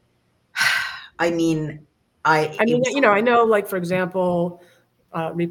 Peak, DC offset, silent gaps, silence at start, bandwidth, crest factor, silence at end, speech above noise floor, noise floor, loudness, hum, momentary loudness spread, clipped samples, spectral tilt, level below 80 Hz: -2 dBFS; under 0.1%; none; 0.55 s; 17 kHz; 18 dB; 0 s; 45 dB; -65 dBFS; -20 LUFS; none; 12 LU; under 0.1%; -5 dB/octave; -62 dBFS